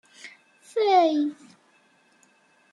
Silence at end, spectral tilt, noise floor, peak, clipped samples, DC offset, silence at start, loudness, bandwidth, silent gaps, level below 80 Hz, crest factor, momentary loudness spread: 1.4 s; -3.5 dB/octave; -62 dBFS; -8 dBFS; under 0.1%; under 0.1%; 0.25 s; -23 LUFS; 11.5 kHz; none; -88 dBFS; 18 dB; 25 LU